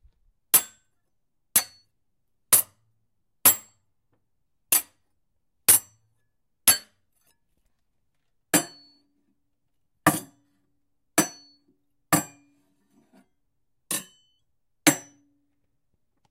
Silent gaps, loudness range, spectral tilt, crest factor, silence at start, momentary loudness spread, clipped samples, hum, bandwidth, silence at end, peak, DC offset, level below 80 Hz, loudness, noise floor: none; 7 LU; -1.5 dB/octave; 26 dB; 0.55 s; 14 LU; under 0.1%; none; 16 kHz; 1.3 s; -2 dBFS; under 0.1%; -68 dBFS; -22 LUFS; -79 dBFS